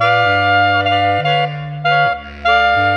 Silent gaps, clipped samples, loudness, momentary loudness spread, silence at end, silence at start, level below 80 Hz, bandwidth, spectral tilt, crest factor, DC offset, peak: none; under 0.1%; -14 LUFS; 6 LU; 0 s; 0 s; -42 dBFS; 8.2 kHz; -6 dB/octave; 12 dB; under 0.1%; -2 dBFS